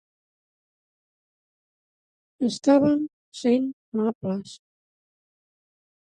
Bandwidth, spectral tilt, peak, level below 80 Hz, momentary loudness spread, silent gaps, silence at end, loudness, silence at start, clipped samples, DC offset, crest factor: 9.6 kHz; -6 dB/octave; -8 dBFS; -68 dBFS; 13 LU; 3.13-3.32 s, 3.73-3.92 s, 4.15-4.21 s; 1.5 s; -24 LUFS; 2.4 s; under 0.1%; under 0.1%; 20 dB